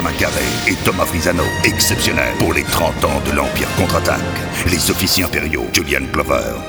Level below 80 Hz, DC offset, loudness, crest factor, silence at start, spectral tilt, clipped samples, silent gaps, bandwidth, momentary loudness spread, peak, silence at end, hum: -30 dBFS; under 0.1%; -16 LUFS; 16 dB; 0 s; -3.5 dB/octave; under 0.1%; none; over 20 kHz; 4 LU; 0 dBFS; 0 s; none